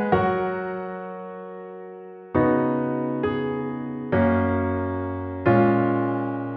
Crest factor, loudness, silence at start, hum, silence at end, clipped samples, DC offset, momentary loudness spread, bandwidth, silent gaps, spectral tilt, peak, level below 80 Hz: 18 dB; -24 LUFS; 0 s; none; 0 s; under 0.1%; under 0.1%; 17 LU; 4.9 kHz; none; -11 dB/octave; -6 dBFS; -52 dBFS